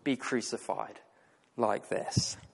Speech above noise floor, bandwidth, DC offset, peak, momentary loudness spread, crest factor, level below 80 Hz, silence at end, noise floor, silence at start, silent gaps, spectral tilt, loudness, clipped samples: 32 dB; 11.5 kHz; under 0.1%; -12 dBFS; 8 LU; 22 dB; -66 dBFS; 0.05 s; -65 dBFS; 0.05 s; none; -4 dB/octave; -33 LUFS; under 0.1%